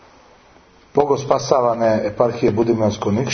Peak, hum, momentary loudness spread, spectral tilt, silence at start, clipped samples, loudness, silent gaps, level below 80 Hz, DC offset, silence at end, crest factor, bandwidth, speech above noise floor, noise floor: 0 dBFS; none; 4 LU; -6 dB/octave; 0.95 s; under 0.1%; -18 LUFS; none; -50 dBFS; under 0.1%; 0 s; 18 dB; 6.6 kHz; 32 dB; -49 dBFS